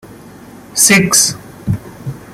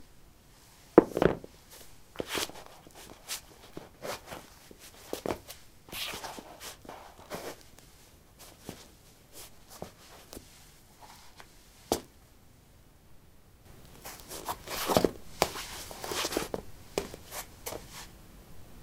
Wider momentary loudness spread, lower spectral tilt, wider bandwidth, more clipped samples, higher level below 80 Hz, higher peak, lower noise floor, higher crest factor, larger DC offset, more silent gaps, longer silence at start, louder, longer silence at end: second, 19 LU vs 25 LU; second, -2.5 dB/octave vs -4 dB/octave; first, over 20 kHz vs 16.5 kHz; neither; first, -44 dBFS vs -56 dBFS; about the same, 0 dBFS vs -2 dBFS; second, -36 dBFS vs -58 dBFS; second, 16 dB vs 36 dB; neither; neither; about the same, 0.05 s vs 0 s; first, -11 LUFS vs -34 LUFS; about the same, 0 s vs 0 s